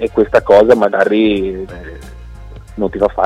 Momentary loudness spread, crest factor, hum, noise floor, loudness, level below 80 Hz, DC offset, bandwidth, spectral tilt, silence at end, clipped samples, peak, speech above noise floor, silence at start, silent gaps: 23 LU; 14 dB; none; -32 dBFS; -12 LUFS; -34 dBFS; under 0.1%; 11 kHz; -6.5 dB/octave; 0 s; under 0.1%; 0 dBFS; 20 dB; 0 s; none